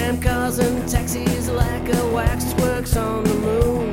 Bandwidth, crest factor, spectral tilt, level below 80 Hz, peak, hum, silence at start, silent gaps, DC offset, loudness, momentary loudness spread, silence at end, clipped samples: 16.5 kHz; 18 dB; -5.5 dB/octave; -26 dBFS; -2 dBFS; none; 0 s; none; under 0.1%; -21 LUFS; 2 LU; 0 s; under 0.1%